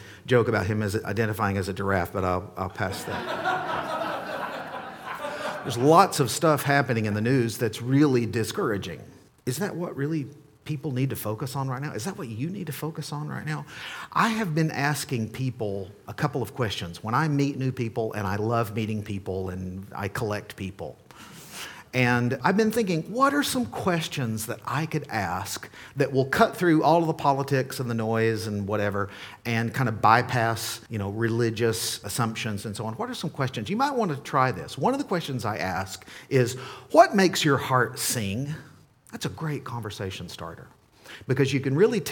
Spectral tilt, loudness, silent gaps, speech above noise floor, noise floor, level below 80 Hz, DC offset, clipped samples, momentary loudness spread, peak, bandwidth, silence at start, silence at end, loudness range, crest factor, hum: -5.5 dB/octave; -26 LUFS; none; 20 dB; -46 dBFS; -60 dBFS; under 0.1%; under 0.1%; 14 LU; -2 dBFS; 19 kHz; 0 s; 0 s; 7 LU; 24 dB; none